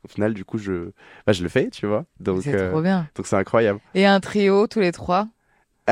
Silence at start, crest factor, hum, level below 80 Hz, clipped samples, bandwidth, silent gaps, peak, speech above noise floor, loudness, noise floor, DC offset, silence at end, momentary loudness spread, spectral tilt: 0.15 s; 16 dB; none; -56 dBFS; under 0.1%; 11 kHz; none; -4 dBFS; 44 dB; -22 LUFS; -65 dBFS; under 0.1%; 0 s; 10 LU; -6.5 dB/octave